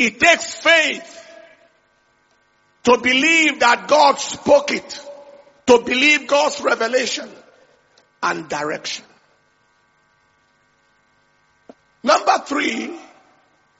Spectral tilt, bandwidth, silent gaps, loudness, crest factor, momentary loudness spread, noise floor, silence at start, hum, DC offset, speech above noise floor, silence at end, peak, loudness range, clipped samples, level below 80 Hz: 0 dB/octave; 8 kHz; none; -16 LUFS; 20 dB; 16 LU; -60 dBFS; 0 s; none; under 0.1%; 44 dB; 0.75 s; 0 dBFS; 13 LU; under 0.1%; -60 dBFS